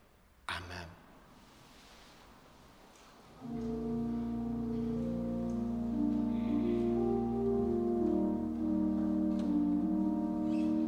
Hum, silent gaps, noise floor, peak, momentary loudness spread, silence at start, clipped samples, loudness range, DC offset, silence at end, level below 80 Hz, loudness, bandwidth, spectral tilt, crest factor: none; none; -58 dBFS; -22 dBFS; 9 LU; 0.5 s; under 0.1%; 15 LU; under 0.1%; 0 s; -52 dBFS; -34 LUFS; 10 kHz; -8 dB/octave; 14 dB